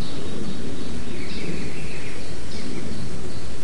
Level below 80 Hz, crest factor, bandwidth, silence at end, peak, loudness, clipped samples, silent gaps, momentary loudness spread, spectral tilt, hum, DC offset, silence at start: -42 dBFS; 16 dB; 11.5 kHz; 0 s; -10 dBFS; -33 LUFS; under 0.1%; none; 3 LU; -5 dB/octave; none; 20%; 0 s